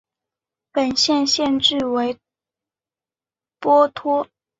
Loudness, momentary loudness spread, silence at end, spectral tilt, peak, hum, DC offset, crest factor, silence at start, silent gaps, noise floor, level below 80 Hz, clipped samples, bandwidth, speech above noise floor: -19 LUFS; 10 LU; 0.35 s; -2.5 dB/octave; -4 dBFS; none; under 0.1%; 18 dB; 0.75 s; none; under -90 dBFS; -60 dBFS; under 0.1%; 8 kHz; over 72 dB